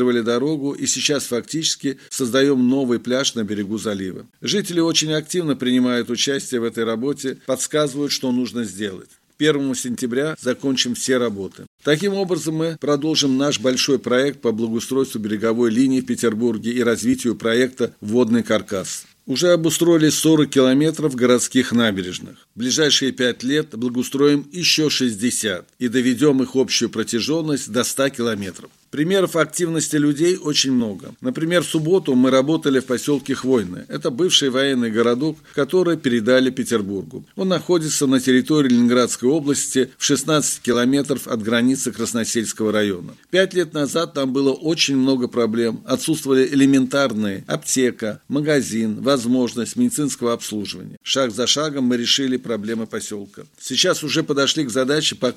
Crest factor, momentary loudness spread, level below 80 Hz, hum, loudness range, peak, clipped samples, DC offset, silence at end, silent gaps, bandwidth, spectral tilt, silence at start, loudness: 18 dB; 9 LU; -64 dBFS; none; 3 LU; 0 dBFS; under 0.1%; under 0.1%; 0.05 s; 11.67-11.78 s, 50.97-51.01 s; 15 kHz; -4 dB/octave; 0 s; -19 LUFS